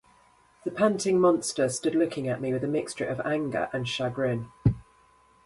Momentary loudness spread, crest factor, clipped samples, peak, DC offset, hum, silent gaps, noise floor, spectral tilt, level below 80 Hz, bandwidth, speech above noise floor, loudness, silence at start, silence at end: 8 LU; 20 dB; under 0.1%; -8 dBFS; under 0.1%; none; none; -60 dBFS; -5.5 dB/octave; -52 dBFS; 11.5 kHz; 34 dB; -27 LUFS; 0.65 s; 0.65 s